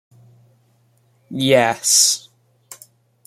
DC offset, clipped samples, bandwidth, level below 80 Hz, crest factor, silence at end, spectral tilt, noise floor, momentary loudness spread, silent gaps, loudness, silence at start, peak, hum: under 0.1%; under 0.1%; 16 kHz; -66 dBFS; 20 dB; 0.5 s; -2 dB/octave; -59 dBFS; 12 LU; none; -15 LUFS; 1.3 s; -2 dBFS; none